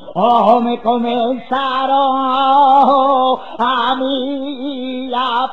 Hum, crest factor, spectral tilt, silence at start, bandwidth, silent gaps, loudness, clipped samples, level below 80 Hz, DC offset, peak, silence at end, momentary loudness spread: none; 14 dB; -6.5 dB/octave; 0 s; 6.6 kHz; none; -14 LUFS; under 0.1%; -58 dBFS; 1%; 0 dBFS; 0 s; 12 LU